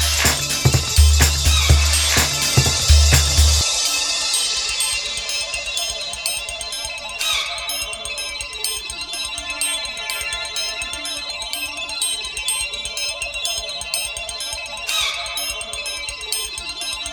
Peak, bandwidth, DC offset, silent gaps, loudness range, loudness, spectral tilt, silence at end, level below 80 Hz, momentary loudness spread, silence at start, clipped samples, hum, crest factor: 0 dBFS; over 20 kHz; under 0.1%; none; 8 LU; -19 LUFS; -2 dB/octave; 0 s; -24 dBFS; 10 LU; 0 s; under 0.1%; none; 20 dB